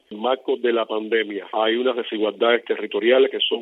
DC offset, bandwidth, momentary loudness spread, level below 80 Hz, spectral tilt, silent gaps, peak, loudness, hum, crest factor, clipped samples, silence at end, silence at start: under 0.1%; 4.1 kHz; 7 LU; -84 dBFS; -6 dB/octave; none; -4 dBFS; -21 LUFS; none; 16 dB; under 0.1%; 0 s; 0.1 s